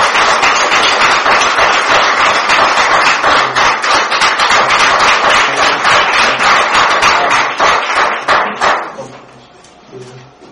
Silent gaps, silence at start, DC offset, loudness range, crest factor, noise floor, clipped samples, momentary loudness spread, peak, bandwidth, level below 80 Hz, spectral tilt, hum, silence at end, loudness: none; 0 s; under 0.1%; 3 LU; 10 dB; -39 dBFS; 0.2%; 4 LU; 0 dBFS; 15 kHz; -42 dBFS; -1 dB/octave; none; 0.3 s; -9 LUFS